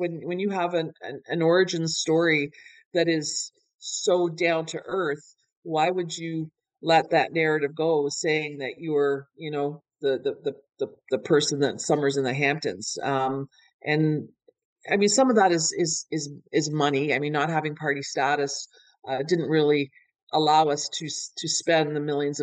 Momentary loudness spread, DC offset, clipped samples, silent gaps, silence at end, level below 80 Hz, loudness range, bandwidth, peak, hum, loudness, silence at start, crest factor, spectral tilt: 12 LU; under 0.1%; under 0.1%; 2.86-2.91 s, 3.74-3.79 s, 5.57-5.62 s, 13.74-13.79 s, 14.65-14.76 s, 20.22-20.27 s; 0 s; -76 dBFS; 3 LU; 9.6 kHz; -8 dBFS; none; -25 LUFS; 0 s; 18 dB; -4 dB/octave